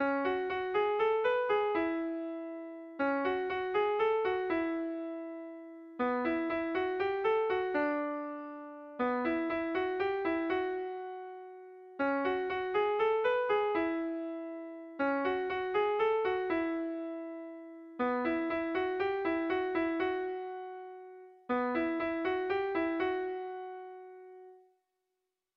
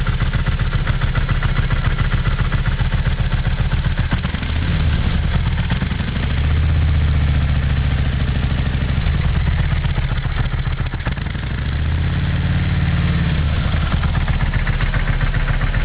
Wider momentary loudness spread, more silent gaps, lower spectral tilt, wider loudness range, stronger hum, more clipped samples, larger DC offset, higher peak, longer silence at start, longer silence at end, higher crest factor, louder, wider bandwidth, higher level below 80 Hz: first, 16 LU vs 4 LU; neither; second, -6.5 dB/octave vs -10.5 dB/octave; about the same, 2 LU vs 2 LU; neither; neither; second, under 0.1% vs 0.7%; second, -20 dBFS vs -4 dBFS; about the same, 0 s vs 0 s; first, 1 s vs 0 s; about the same, 14 dB vs 12 dB; second, -33 LUFS vs -19 LUFS; first, 6 kHz vs 4 kHz; second, -68 dBFS vs -20 dBFS